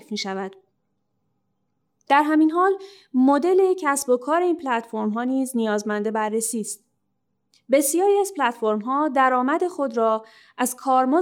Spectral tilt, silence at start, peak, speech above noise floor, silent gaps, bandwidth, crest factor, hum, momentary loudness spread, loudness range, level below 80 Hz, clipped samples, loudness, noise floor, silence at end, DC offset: -4 dB/octave; 0.1 s; -6 dBFS; 54 dB; none; 18.5 kHz; 16 dB; none; 9 LU; 4 LU; -78 dBFS; under 0.1%; -22 LUFS; -75 dBFS; 0 s; under 0.1%